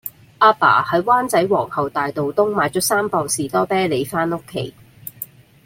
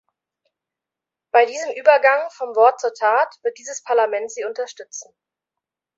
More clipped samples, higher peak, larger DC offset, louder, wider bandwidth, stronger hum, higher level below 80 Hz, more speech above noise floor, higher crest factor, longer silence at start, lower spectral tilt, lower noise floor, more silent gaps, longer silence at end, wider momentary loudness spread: neither; about the same, -2 dBFS vs 0 dBFS; neither; about the same, -18 LUFS vs -18 LUFS; first, 16.5 kHz vs 8 kHz; neither; first, -56 dBFS vs -80 dBFS; second, 20 dB vs 68 dB; about the same, 18 dB vs 20 dB; second, 0.05 s vs 1.35 s; first, -4 dB/octave vs 0.5 dB/octave; second, -37 dBFS vs -87 dBFS; neither; second, 0.4 s vs 0.95 s; about the same, 17 LU vs 15 LU